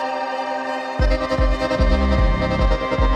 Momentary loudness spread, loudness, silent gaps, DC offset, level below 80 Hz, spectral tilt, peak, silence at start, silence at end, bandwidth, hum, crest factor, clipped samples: 6 LU; -20 LUFS; none; under 0.1%; -22 dBFS; -7 dB/octave; -6 dBFS; 0 s; 0 s; 8.8 kHz; none; 14 dB; under 0.1%